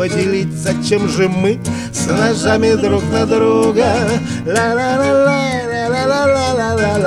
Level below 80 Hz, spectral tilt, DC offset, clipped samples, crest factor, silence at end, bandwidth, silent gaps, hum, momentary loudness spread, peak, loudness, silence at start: -42 dBFS; -5.5 dB/octave; under 0.1%; under 0.1%; 14 dB; 0 s; 14 kHz; none; none; 6 LU; 0 dBFS; -14 LUFS; 0 s